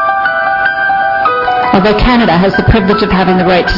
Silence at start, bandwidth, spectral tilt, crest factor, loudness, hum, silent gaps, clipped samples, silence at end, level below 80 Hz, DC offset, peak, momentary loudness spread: 0 s; 6 kHz; -7.5 dB/octave; 10 dB; -9 LUFS; none; none; 0.1%; 0 s; -22 dBFS; under 0.1%; 0 dBFS; 3 LU